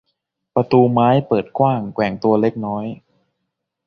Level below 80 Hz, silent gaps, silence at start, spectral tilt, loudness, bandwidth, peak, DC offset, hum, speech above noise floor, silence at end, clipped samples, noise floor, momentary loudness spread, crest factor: -56 dBFS; none; 0.55 s; -9.5 dB/octave; -17 LUFS; 6.2 kHz; -2 dBFS; under 0.1%; none; 60 dB; 0.9 s; under 0.1%; -77 dBFS; 11 LU; 18 dB